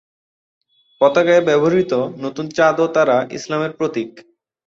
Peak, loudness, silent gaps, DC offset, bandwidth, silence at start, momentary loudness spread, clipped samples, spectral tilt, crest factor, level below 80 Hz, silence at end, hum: -2 dBFS; -17 LUFS; none; under 0.1%; 7.6 kHz; 1 s; 11 LU; under 0.1%; -5.5 dB/octave; 16 dB; -62 dBFS; 0.45 s; none